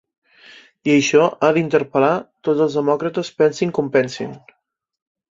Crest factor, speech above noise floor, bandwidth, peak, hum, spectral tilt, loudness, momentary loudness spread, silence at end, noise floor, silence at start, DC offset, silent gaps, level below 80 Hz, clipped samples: 18 dB; 29 dB; 7.8 kHz; -2 dBFS; none; -5.5 dB/octave; -18 LUFS; 10 LU; 0.95 s; -46 dBFS; 0.85 s; under 0.1%; none; -62 dBFS; under 0.1%